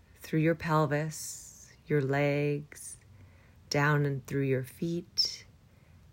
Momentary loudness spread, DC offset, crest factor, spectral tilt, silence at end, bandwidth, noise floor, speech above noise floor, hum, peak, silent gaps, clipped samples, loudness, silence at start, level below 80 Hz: 17 LU; under 0.1%; 16 dB; -5 dB/octave; 0.7 s; 16 kHz; -58 dBFS; 29 dB; none; -16 dBFS; none; under 0.1%; -30 LUFS; 0.2 s; -64 dBFS